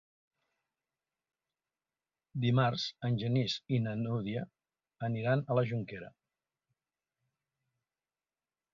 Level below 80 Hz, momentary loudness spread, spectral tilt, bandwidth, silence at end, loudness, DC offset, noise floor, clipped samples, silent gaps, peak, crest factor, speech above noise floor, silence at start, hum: -70 dBFS; 15 LU; -7 dB/octave; 7.2 kHz; 2.65 s; -33 LUFS; under 0.1%; under -90 dBFS; under 0.1%; none; -16 dBFS; 20 dB; over 58 dB; 2.35 s; none